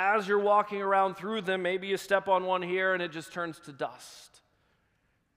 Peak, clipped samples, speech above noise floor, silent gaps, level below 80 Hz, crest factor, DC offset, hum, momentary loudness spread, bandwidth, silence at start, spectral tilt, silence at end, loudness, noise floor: -12 dBFS; under 0.1%; 44 dB; none; -76 dBFS; 18 dB; under 0.1%; none; 12 LU; 15.5 kHz; 0 s; -4.5 dB/octave; 1.1 s; -29 LUFS; -73 dBFS